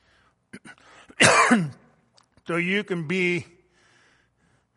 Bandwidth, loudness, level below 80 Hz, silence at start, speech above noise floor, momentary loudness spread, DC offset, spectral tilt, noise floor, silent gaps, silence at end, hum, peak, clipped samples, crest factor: 11.5 kHz; -21 LUFS; -64 dBFS; 0.55 s; 42 dB; 14 LU; under 0.1%; -3.5 dB/octave; -66 dBFS; none; 1.35 s; none; -2 dBFS; under 0.1%; 24 dB